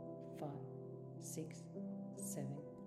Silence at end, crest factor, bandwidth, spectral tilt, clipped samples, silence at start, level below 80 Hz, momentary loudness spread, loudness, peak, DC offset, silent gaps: 0 s; 16 dB; 15 kHz; -6 dB/octave; under 0.1%; 0 s; -80 dBFS; 6 LU; -49 LUFS; -34 dBFS; under 0.1%; none